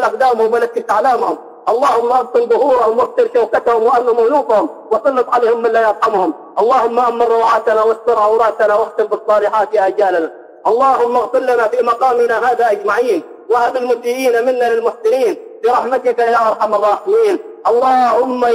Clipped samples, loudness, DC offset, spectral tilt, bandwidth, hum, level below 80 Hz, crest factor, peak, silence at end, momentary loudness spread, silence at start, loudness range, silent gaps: under 0.1%; -14 LUFS; under 0.1%; -4 dB/octave; 15.5 kHz; none; -58 dBFS; 10 dB; -2 dBFS; 0 s; 5 LU; 0 s; 1 LU; none